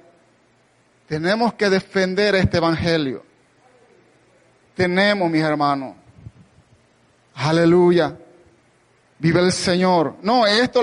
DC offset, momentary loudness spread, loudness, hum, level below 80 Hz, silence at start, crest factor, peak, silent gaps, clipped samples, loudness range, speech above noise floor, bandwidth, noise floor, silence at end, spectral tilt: under 0.1%; 10 LU; -18 LUFS; none; -48 dBFS; 1.1 s; 16 dB; -6 dBFS; none; under 0.1%; 4 LU; 41 dB; 11.5 kHz; -58 dBFS; 0 s; -5.5 dB/octave